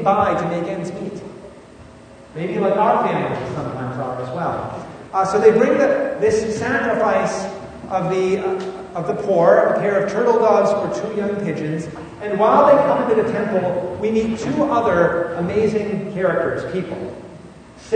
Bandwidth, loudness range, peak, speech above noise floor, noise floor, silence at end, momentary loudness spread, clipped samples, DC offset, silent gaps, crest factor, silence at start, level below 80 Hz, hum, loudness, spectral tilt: 9.6 kHz; 5 LU; 0 dBFS; 24 dB; -42 dBFS; 0 s; 15 LU; under 0.1%; under 0.1%; none; 18 dB; 0 s; -50 dBFS; none; -19 LUFS; -6.5 dB/octave